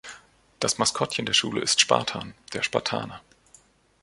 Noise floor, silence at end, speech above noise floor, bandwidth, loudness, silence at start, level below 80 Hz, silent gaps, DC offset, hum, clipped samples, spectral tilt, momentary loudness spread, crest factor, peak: -58 dBFS; 0.85 s; 32 dB; 11.5 kHz; -24 LUFS; 0.05 s; -60 dBFS; none; under 0.1%; none; under 0.1%; -2 dB/octave; 15 LU; 24 dB; -2 dBFS